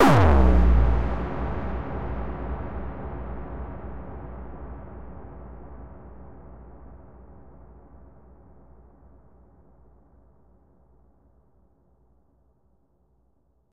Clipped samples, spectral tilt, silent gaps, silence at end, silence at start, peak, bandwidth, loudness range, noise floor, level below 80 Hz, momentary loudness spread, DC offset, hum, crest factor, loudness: under 0.1%; -7.5 dB/octave; none; 0 s; 0 s; -6 dBFS; 11 kHz; 27 LU; -67 dBFS; -30 dBFS; 28 LU; under 0.1%; none; 20 dB; -26 LUFS